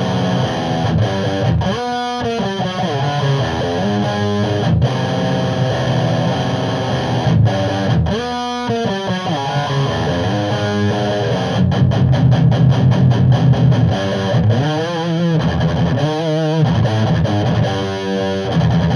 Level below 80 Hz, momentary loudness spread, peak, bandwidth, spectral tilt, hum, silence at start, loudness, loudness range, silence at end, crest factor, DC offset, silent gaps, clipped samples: -32 dBFS; 6 LU; -2 dBFS; 10.5 kHz; -7 dB/octave; none; 0 s; -16 LUFS; 4 LU; 0 s; 12 dB; under 0.1%; none; under 0.1%